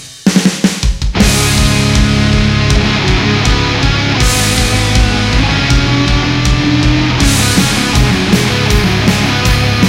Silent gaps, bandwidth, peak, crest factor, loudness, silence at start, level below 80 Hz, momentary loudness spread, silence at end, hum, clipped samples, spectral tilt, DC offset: none; 16.5 kHz; 0 dBFS; 10 dB; -11 LUFS; 0 s; -16 dBFS; 2 LU; 0 s; none; under 0.1%; -4.5 dB/octave; under 0.1%